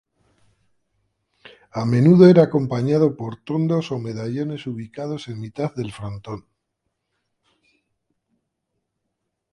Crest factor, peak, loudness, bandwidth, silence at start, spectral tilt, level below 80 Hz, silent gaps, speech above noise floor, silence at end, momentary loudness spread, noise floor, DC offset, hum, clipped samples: 22 dB; 0 dBFS; -19 LUFS; 9.6 kHz; 1.75 s; -8.5 dB/octave; -58 dBFS; none; 59 dB; 3.15 s; 20 LU; -78 dBFS; under 0.1%; none; under 0.1%